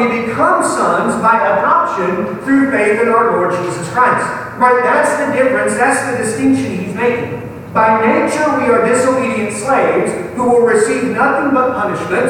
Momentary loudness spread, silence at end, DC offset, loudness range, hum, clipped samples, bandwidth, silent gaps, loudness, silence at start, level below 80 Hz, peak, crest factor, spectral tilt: 6 LU; 0 s; under 0.1%; 1 LU; none; under 0.1%; 16 kHz; none; -13 LUFS; 0 s; -50 dBFS; 0 dBFS; 12 dB; -5 dB/octave